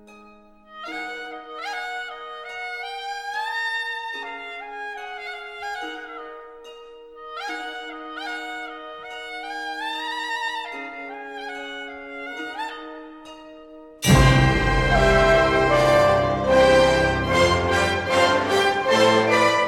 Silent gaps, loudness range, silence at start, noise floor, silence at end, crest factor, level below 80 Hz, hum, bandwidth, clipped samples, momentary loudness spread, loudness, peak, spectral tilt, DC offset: none; 16 LU; 0.1 s; -49 dBFS; 0 s; 18 dB; -36 dBFS; none; 16.5 kHz; under 0.1%; 19 LU; -21 LUFS; -4 dBFS; -5 dB/octave; under 0.1%